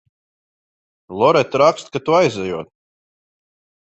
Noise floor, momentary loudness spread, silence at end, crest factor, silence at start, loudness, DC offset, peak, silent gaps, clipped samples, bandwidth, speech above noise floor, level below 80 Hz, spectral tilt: under -90 dBFS; 13 LU; 1.15 s; 18 dB; 1.1 s; -17 LUFS; under 0.1%; -2 dBFS; none; under 0.1%; 8.2 kHz; over 74 dB; -58 dBFS; -5.5 dB/octave